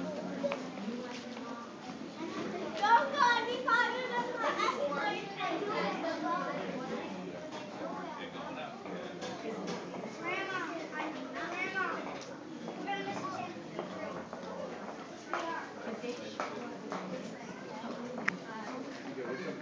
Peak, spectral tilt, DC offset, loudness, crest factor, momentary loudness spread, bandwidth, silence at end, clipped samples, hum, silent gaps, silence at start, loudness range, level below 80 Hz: -12 dBFS; -4.5 dB/octave; under 0.1%; -37 LUFS; 26 dB; 13 LU; 8 kHz; 0 s; under 0.1%; none; none; 0 s; 10 LU; -76 dBFS